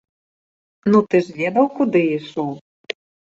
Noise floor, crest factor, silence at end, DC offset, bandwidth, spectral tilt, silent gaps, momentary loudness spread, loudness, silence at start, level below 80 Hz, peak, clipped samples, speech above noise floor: under -90 dBFS; 18 dB; 0.35 s; under 0.1%; 7.8 kHz; -7.5 dB/octave; 2.61-2.84 s; 16 LU; -19 LUFS; 0.85 s; -64 dBFS; -2 dBFS; under 0.1%; over 72 dB